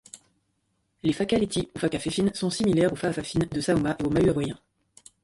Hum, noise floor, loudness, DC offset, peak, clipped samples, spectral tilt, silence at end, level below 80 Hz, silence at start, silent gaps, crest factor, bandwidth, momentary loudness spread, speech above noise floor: none; -73 dBFS; -26 LUFS; under 0.1%; -10 dBFS; under 0.1%; -5.5 dB/octave; 0.7 s; -50 dBFS; 0.15 s; none; 16 dB; 11.5 kHz; 6 LU; 49 dB